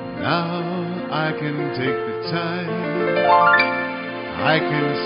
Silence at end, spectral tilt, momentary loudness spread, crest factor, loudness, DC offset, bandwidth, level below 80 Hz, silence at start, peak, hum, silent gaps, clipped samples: 0 s; -3.5 dB/octave; 10 LU; 18 dB; -20 LUFS; under 0.1%; 5.6 kHz; -58 dBFS; 0 s; -2 dBFS; none; none; under 0.1%